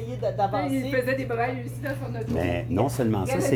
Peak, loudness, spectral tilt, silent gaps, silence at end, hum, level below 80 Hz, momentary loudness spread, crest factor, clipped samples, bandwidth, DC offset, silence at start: -10 dBFS; -27 LUFS; -6.5 dB/octave; none; 0 s; none; -46 dBFS; 7 LU; 16 dB; under 0.1%; 19.5 kHz; under 0.1%; 0 s